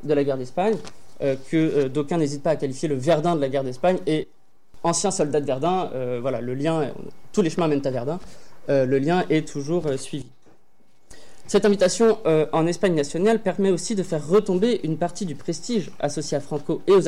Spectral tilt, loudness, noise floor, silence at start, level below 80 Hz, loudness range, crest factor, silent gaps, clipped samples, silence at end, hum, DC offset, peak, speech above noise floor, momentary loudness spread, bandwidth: -5.5 dB/octave; -23 LUFS; -64 dBFS; 0.05 s; -54 dBFS; 4 LU; 14 dB; none; under 0.1%; 0 s; none; 2%; -10 dBFS; 42 dB; 8 LU; 12.5 kHz